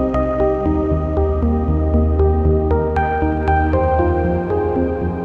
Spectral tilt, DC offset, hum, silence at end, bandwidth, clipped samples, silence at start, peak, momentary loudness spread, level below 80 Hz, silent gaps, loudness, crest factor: -10.5 dB/octave; under 0.1%; none; 0 s; 4.1 kHz; under 0.1%; 0 s; -4 dBFS; 3 LU; -24 dBFS; none; -17 LUFS; 12 dB